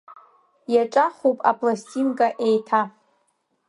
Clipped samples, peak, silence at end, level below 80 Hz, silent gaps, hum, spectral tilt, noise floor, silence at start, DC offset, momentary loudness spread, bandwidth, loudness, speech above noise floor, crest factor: under 0.1%; -2 dBFS; 0.8 s; -78 dBFS; none; none; -5.5 dB/octave; -70 dBFS; 0.1 s; under 0.1%; 5 LU; 11 kHz; -22 LUFS; 49 dB; 20 dB